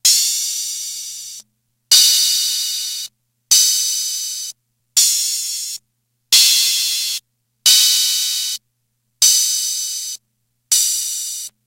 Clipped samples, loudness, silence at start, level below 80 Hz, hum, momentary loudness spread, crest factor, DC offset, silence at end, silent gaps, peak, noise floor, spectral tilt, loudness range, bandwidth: under 0.1%; -14 LUFS; 0.05 s; -74 dBFS; 60 Hz at -70 dBFS; 17 LU; 18 dB; under 0.1%; 0.2 s; none; 0 dBFS; -70 dBFS; 6 dB/octave; 3 LU; 16 kHz